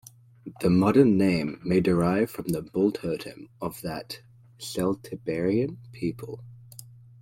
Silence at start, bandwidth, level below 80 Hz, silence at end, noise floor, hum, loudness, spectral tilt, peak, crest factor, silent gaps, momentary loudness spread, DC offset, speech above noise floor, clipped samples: 0.45 s; 16.5 kHz; -54 dBFS; 0.4 s; -48 dBFS; none; -26 LUFS; -7 dB/octave; -6 dBFS; 20 dB; none; 22 LU; under 0.1%; 22 dB; under 0.1%